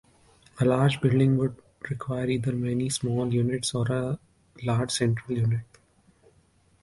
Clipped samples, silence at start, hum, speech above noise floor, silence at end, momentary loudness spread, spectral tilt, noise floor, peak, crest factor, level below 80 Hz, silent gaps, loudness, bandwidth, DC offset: under 0.1%; 0.55 s; none; 38 dB; 1.2 s; 10 LU; -6 dB/octave; -63 dBFS; -10 dBFS; 18 dB; -56 dBFS; none; -26 LUFS; 11.5 kHz; under 0.1%